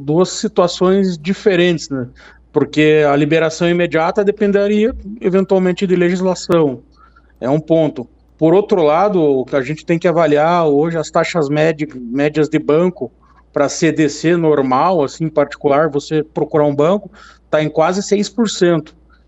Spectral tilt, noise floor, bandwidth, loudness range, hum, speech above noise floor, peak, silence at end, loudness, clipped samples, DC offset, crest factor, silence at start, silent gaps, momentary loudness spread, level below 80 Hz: -6 dB/octave; -47 dBFS; 8.2 kHz; 2 LU; none; 33 dB; 0 dBFS; 0.45 s; -15 LUFS; under 0.1%; under 0.1%; 14 dB; 0 s; none; 7 LU; -46 dBFS